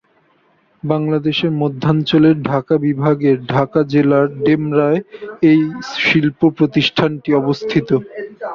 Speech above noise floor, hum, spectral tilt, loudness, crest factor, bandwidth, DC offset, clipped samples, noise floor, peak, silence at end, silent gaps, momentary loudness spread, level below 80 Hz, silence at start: 42 dB; none; -7.5 dB/octave; -15 LUFS; 14 dB; 7 kHz; under 0.1%; under 0.1%; -57 dBFS; -2 dBFS; 0 s; none; 7 LU; -54 dBFS; 0.85 s